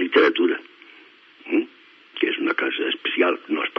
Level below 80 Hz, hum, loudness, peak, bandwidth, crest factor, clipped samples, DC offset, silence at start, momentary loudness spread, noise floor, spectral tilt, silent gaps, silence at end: under -90 dBFS; none; -22 LUFS; -4 dBFS; 6 kHz; 20 dB; under 0.1%; under 0.1%; 0 s; 14 LU; -50 dBFS; 0.5 dB/octave; none; 0.1 s